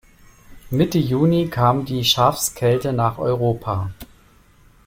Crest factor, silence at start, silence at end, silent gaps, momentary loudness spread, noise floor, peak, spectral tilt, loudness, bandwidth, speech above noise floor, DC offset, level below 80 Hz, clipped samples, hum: 18 dB; 0.5 s; 0.8 s; none; 9 LU; -52 dBFS; -2 dBFS; -5.5 dB/octave; -19 LUFS; 16.5 kHz; 33 dB; under 0.1%; -46 dBFS; under 0.1%; none